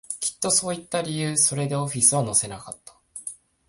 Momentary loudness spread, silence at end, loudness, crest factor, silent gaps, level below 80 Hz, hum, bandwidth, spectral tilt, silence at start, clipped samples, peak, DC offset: 19 LU; 0.35 s; -22 LUFS; 22 dB; none; -60 dBFS; none; 11.5 kHz; -3 dB/octave; 0.1 s; under 0.1%; -2 dBFS; under 0.1%